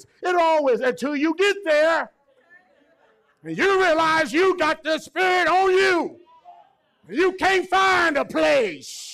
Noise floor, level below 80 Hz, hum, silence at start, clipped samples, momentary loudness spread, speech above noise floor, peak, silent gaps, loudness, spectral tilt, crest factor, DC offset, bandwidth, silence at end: -60 dBFS; -58 dBFS; none; 0.2 s; under 0.1%; 7 LU; 40 dB; -12 dBFS; none; -20 LUFS; -3.5 dB/octave; 10 dB; under 0.1%; 14 kHz; 0 s